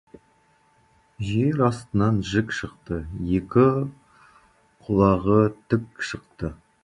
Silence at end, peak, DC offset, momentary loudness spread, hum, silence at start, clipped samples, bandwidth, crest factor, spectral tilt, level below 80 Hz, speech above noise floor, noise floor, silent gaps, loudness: 0.3 s; -4 dBFS; under 0.1%; 14 LU; none; 1.2 s; under 0.1%; 11 kHz; 20 dB; -7.5 dB/octave; -44 dBFS; 39 dB; -61 dBFS; none; -24 LUFS